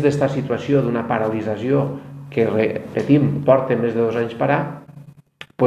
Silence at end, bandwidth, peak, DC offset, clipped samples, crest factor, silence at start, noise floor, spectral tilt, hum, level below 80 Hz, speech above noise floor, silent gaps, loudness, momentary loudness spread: 0 s; 9.4 kHz; 0 dBFS; under 0.1%; under 0.1%; 18 dB; 0 s; -43 dBFS; -8.5 dB/octave; none; -54 dBFS; 25 dB; none; -19 LUFS; 10 LU